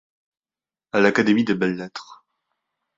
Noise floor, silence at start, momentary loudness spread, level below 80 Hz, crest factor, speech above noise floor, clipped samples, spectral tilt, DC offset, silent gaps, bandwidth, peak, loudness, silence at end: under -90 dBFS; 0.95 s; 17 LU; -64 dBFS; 22 dB; over 70 dB; under 0.1%; -6 dB/octave; under 0.1%; none; 7.8 kHz; -2 dBFS; -20 LUFS; 0.85 s